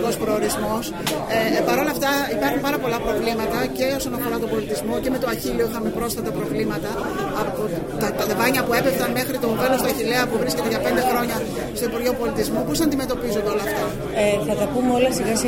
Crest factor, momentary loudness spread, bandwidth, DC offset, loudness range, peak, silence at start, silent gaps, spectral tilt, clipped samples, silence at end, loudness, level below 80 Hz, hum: 16 dB; 5 LU; 16.5 kHz; under 0.1%; 3 LU; -6 dBFS; 0 s; none; -4.5 dB/octave; under 0.1%; 0 s; -22 LUFS; -42 dBFS; none